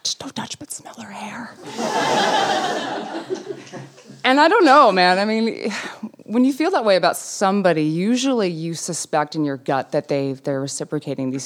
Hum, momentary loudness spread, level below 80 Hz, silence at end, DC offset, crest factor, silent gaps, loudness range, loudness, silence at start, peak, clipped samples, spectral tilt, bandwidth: none; 18 LU; -74 dBFS; 0 s; under 0.1%; 18 dB; none; 7 LU; -19 LUFS; 0.05 s; -2 dBFS; under 0.1%; -4 dB/octave; 16 kHz